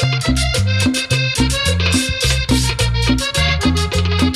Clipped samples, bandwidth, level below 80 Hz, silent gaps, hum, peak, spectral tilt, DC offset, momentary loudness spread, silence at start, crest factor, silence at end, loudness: under 0.1%; 15.5 kHz; -22 dBFS; none; none; -4 dBFS; -4 dB/octave; under 0.1%; 1 LU; 0 s; 12 dB; 0 s; -16 LUFS